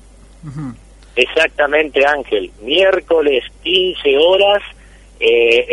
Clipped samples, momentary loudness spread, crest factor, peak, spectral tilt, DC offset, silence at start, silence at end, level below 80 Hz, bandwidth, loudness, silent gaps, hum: under 0.1%; 17 LU; 14 dB; 0 dBFS; -4 dB/octave; under 0.1%; 0.45 s; 0 s; -42 dBFS; 11 kHz; -14 LUFS; none; none